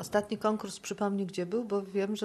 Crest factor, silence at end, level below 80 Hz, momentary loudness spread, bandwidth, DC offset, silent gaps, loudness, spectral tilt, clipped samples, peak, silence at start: 18 dB; 0 s; -70 dBFS; 3 LU; 13 kHz; under 0.1%; none; -33 LUFS; -5.5 dB/octave; under 0.1%; -14 dBFS; 0 s